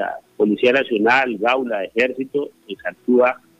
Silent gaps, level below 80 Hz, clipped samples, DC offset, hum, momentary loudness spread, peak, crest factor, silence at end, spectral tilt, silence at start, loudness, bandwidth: none; -66 dBFS; under 0.1%; under 0.1%; none; 12 LU; -4 dBFS; 16 dB; 0.25 s; -5.5 dB/octave; 0 s; -18 LUFS; 9.4 kHz